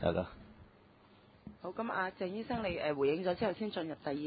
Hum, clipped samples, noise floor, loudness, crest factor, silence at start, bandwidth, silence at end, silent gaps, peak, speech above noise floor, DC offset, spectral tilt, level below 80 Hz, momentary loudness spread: none; under 0.1%; -62 dBFS; -37 LUFS; 22 dB; 0 s; 4.9 kHz; 0 s; none; -16 dBFS; 27 dB; under 0.1%; -4.5 dB/octave; -60 dBFS; 15 LU